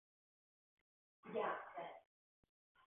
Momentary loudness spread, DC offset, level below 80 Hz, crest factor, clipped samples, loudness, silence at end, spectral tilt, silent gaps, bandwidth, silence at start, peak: 20 LU; under 0.1%; under -90 dBFS; 22 dB; under 0.1%; -47 LUFS; 0.9 s; 0.5 dB/octave; none; 3.7 kHz; 1.25 s; -30 dBFS